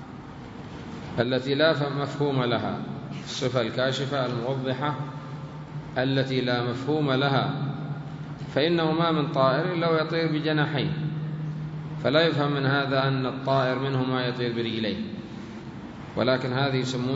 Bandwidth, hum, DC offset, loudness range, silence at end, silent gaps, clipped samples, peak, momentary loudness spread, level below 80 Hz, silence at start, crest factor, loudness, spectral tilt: 7.8 kHz; none; under 0.1%; 3 LU; 0 s; none; under 0.1%; -6 dBFS; 15 LU; -58 dBFS; 0 s; 20 dB; -26 LUFS; -6.5 dB/octave